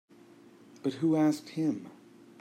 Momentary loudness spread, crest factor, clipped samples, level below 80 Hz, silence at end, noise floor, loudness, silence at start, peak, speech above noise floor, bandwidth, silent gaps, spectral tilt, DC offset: 13 LU; 14 dB; under 0.1%; -80 dBFS; 0.5 s; -56 dBFS; -31 LUFS; 0.85 s; -18 dBFS; 27 dB; 12.5 kHz; none; -7 dB/octave; under 0.1%